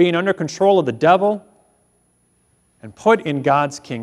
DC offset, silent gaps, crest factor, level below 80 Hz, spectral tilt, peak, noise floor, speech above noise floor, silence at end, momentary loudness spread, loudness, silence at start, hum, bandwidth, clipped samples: under 0.1%; none; 18 dB; -64 dBFS; -6 dB/octave; -2 dBFS; -61 dBFS; 45 dB; 0 s; 6 LU; -17 LUFS; 0 s; 60 Hz at -55 dBFS; 11 kHz; under 0.1%